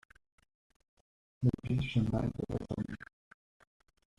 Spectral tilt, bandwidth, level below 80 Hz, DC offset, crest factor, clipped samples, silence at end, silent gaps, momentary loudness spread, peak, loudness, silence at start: -8.5 dB/octave; 9.8 kHz; -54 dBFS; under 0.1%; 22 dB; under 0.1%; 1.15 s; none; 11 LU; -16 dBFS; -35 LUFS; 1.4 s